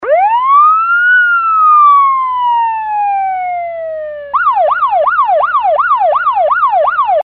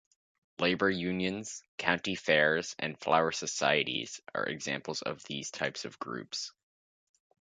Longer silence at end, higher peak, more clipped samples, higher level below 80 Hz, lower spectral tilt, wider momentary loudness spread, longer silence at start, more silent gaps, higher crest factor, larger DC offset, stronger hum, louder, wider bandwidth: second, 0 s vs 1.1 s; first, 0 dBFS vs -8 dBFS; neither; first, -52 dBFS vs -68 dBFS; first, -5 dB/octave vs -3.5 dB/octave; about the same, 10 LU vs 11 LU; second, 0 s vs 0.6 s; second, none vs 1.68-1.78 s; second, 10 dB vs 26 dB; neither; neither; first, -10 LUFS vs -32 LUFS; second, 4.5 kHz vs 9.6 kHz